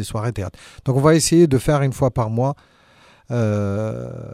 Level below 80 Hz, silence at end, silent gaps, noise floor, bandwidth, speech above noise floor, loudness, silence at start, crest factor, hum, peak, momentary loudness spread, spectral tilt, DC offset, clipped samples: -42 dBFS; 0 s; none; -51 dBFS; 15.5 kHz; 33 dB; -19 LUFS; 0 s; 16 dB; none; -4 dBFS; 15 LU; -6 dB/octave; under 0.1%; under 0.1%